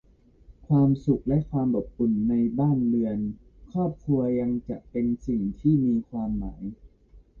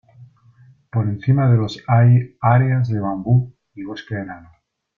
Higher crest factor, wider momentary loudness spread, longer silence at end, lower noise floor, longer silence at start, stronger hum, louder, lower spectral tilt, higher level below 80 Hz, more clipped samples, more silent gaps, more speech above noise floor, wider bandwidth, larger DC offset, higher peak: about the same, 14 dB vs 16 dB; second, 10 LU vs 17 LU; second, 0 s vs 0.6 s; first, -54 dBFS vs -50 dBFS; first, 0.5 s vs 0.2 s; neither; second, -26 LUFS vs -18 LUFS; first, -12 dB/octave vs -9 dB/octave; first, -46 dBFS vs -52 dBFS; neither; neither; about the same, 30 dB vs 33 dB; second, 4.2 kHz vs 6 kHz; neither; second, -10 dBFS vs -2 dBFS